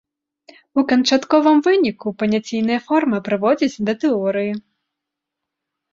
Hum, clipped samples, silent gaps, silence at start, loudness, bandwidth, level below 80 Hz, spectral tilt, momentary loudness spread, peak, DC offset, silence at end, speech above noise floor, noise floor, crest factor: none; under 0.1%; none; 0.75 s; -18 LUFS; 7.6 kHz; -62 dBFS; -5 dB/octave; 8 LU; -2 dBFS; under 0.1%; 1.35 s; 65 dB; -82 dBFS; 18 dB